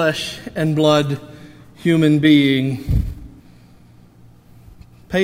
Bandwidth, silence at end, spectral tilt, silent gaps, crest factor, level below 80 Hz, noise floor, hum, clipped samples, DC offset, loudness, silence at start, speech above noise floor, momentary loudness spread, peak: 15.5 kHz; 0 s; -6.5 dB/octave; none; 18 dB; -34 dBFS; -46 dBFS; none; under 0.1%; under 0.1%; -17 LUFS; 0 s; 30 dB; 14 LU; -2 dBFS